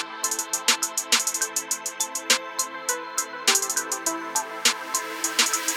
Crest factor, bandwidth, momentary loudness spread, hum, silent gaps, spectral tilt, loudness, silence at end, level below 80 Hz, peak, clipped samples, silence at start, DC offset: 20 dB; over 20 kHz; 7 LU; none; none; 2 dB/octave; -23 LUFS; 0 s; -74 dBFS; -6 dBFS; under 0.1%; 0 s; under 0.1%